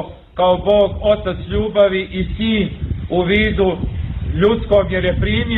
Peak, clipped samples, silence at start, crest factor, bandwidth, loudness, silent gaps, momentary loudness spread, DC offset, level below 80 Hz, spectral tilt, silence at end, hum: -2 dBFS; under 0.1%; 0 s; 14 dB; 4.2 kHz; -17 LUFS; none; 9 LU; under 0.1%; -28 dBFS; -9 dB/octave; 0 s; none